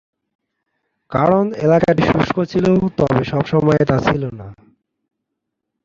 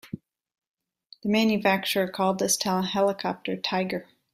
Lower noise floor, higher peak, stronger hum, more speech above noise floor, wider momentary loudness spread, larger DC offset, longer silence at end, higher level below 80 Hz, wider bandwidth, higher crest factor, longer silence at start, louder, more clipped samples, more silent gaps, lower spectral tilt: first, -78 dBFS vs -56 dBFS; first, -2 dBFS vs -8 dBFS; neither; first, 62 dB vs 31 dB; second, 7 LU vs 11 LU; neither; first, 1.3 s vs 0.3 s; first, -42 dBFS vs -66 dBFS; second, 7.6 kHz vs 16 kHz; about the same, 16 dB vs 18 dB; first, 1.1 s vs 0.05 s; first, -16 LUFS vs -25 LUFS; neither; second, none vs 0.68-0.74 s; first, -8 dB/octave vs -3.5 dB/octave